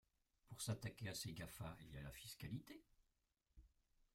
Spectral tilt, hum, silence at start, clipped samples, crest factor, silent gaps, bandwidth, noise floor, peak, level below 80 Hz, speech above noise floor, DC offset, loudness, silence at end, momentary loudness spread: -4 dB/octave; none; 0.45 s; under 0.1%; 22 dB; none; 16 kHz; -87 dBFS; -32 dBFS; -70 dBFS; 36 dB; under 0.1%; -52 LUFS; 0.45 s; 12 LU